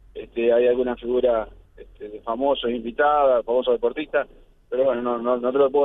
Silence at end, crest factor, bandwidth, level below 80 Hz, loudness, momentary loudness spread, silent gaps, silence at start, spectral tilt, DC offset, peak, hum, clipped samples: 0 s; 16 dB; 3.9 kHz; -50 dBFS; -22 LUFS; 14 LU; none; 0.15 s; -7.5 dB/octave; under 0.1%; -6 dBFS; none; under 0.1%